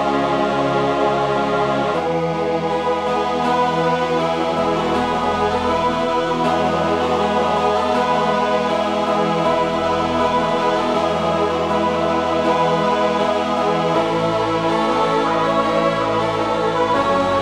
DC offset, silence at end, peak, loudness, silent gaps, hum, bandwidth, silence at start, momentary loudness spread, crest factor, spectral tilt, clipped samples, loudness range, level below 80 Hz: under 0.1%; 0 s; -4 dBFS; -18 LUFS; none; none; 12.5 kHz; 0 s; 2 LU; 14 dB; -5.5 dB/octave; under 0.1%; 1 LU; -44 dBFS